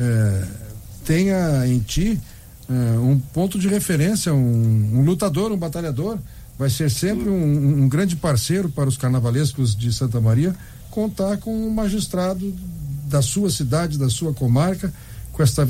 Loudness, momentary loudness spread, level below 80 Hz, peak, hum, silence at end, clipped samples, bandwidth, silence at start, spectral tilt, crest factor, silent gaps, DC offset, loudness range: -20 LUFS; 11 LU; -38 dBFS; -6 dBFS; none; 0 s; under 0.1%; 16 kHz; 0 s; -6 dB/octave; 14 dB; none; under 0.1%; 3 LU